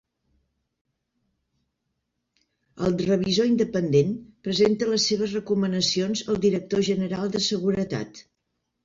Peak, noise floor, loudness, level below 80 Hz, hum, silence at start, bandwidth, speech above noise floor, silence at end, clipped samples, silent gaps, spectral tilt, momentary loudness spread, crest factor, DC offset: -8 dBFS; -78 dBFS; -24 LUFS; -58 dBFS; none; 2.75 s; 7.6 kHz; 55 dB; 0.65 s; under 0.1%; none; -5 dB/octave; 7 LU; 18 dB; under 0.1%